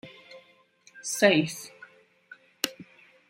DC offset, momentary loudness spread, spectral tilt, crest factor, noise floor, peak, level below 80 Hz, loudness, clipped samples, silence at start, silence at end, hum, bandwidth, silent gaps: under 0.1%; 24 LU; -3.5 dB/octave; 26 dB; -60 dBFS; -6 dBFS; -76 dBFS; -26 LUFS; under 0.1%; 0.05 s; 0.45 s; none; 16 kHz; none